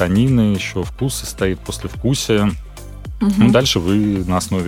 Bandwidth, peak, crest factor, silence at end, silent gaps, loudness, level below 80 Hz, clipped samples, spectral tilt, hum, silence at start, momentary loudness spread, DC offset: 16 kHz; 0 dBFS; 16 dB; 0 s; none; -17 LUFS; -34 dBFS; under 0.1%; -5.5 dB/octave; none; 0 s; 14 LU; under 0.1%